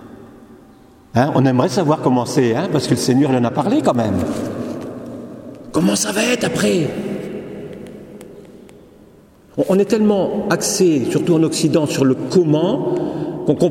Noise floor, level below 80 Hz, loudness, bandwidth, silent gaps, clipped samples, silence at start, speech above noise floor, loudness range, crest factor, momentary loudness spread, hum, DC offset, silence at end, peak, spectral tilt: -46 dBFS; -52 dBFS; -17 LUFS; 16.5 kHz; none; under 0.1%; 0 s; 31 dB; 6 LU; 18 dB; 17 LU; none; under 0.1%; 0 s; 0 dBFS; -5.5 dB/octave